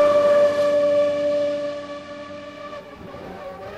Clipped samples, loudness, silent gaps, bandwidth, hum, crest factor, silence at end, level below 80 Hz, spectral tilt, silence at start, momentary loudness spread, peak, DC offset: under 0.1%; -19 LUFS; none; 9.6 kHz; none; 14 dB; 0 s; -58 dBFS; -5 dB/octave; 0 s; 20 LU; -8 dBFS; under 0.1%